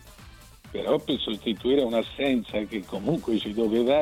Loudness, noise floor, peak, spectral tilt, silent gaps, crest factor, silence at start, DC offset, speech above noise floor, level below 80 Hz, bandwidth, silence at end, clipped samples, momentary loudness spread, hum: -26 LUFS; -48 dBFS; -10 dBFS; -6 dB/octave; none; 18 dB; 0.05 s; under 0.1%; 23 dB; -52 dBFS; 16 kHz; 0 s; under 0.1%; 7 LU; none